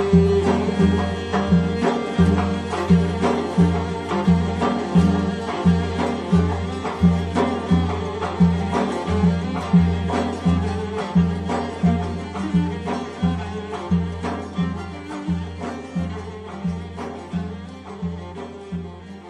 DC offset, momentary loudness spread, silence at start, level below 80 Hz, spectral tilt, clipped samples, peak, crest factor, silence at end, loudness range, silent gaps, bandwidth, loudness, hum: under 0.1%; 12 LU; 0 s; -36 dBFS; -7.5 dB/octave; under 0.1%; -4 dBFS; 18 dB; 0 s; 9 LU; none; 9.6 kHz; -21 LUFS; none